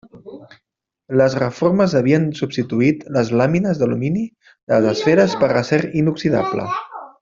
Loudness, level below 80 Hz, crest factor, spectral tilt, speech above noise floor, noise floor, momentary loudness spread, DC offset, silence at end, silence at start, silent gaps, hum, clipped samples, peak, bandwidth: -18 LUFS; -54 dBFS; 16 dB; -7 dB/octave; 59 dB; -76 dBFS; 8 LU; under 0.1%; 0.15 s; 0.15 s; 4.63-4.67 s; none; under 0.1%; -2 dBFS; 7.6 kHz